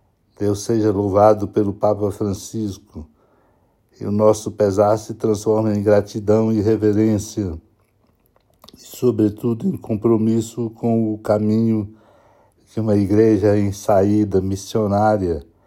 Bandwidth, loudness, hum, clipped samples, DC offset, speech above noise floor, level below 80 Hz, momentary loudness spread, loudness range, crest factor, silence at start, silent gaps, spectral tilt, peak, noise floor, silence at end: 16 kHz; -18 LUFS; none; under 0.1%; under 0.1%; 43 dB; -52 dBFS; 11 LU; 4 LU; 18 dB; 0.4 s; none; -7.5 dB/octave; 0 dBFS; -60 dBFS; 0.25 s